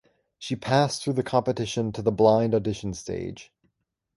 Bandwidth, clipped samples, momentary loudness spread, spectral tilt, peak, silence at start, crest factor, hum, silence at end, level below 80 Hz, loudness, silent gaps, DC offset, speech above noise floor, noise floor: 11.5 kHz; under 0.1%; 14 LU; -6 dB/octave; -6 dBFS; 0.4 s; 20 dB; none; 0.75 s; -54 dBFS; -25 LUFS; none; under 0.1%; 52 dB; -76 dBFS